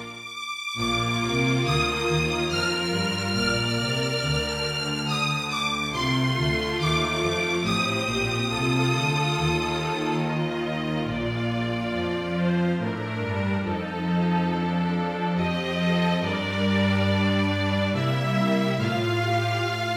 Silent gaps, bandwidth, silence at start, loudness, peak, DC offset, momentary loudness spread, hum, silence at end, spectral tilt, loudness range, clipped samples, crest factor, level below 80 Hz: none; 16.5 kHz; 0 s; -25 LUFS; -10 dBFS; under 0.1%; 5 LU; none; 0 s; -5 dB/octave; 3 LU; under 0.1%; 14 dB; -48 dBFS